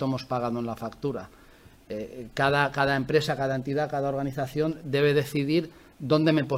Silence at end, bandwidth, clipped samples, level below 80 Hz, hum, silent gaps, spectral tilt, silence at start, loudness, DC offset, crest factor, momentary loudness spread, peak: 0 s; 16 kHz; under 0.1%; -56 dBFS; none; none; -6.5 dB/octave; 0 s; -27 LUFS; under 0.1%; 20 dB; 13 LU; -8 dBFS